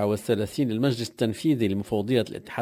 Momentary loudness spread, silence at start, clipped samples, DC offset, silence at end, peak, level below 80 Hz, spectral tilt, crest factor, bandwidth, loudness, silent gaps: 3 LU; 0 s; under 0.1%; under 0.1%; 0 s; -10 dBFS; -54 dBFS; -6.5 dB/octave; 16 dB; 16 kHz; -26 LUFS; none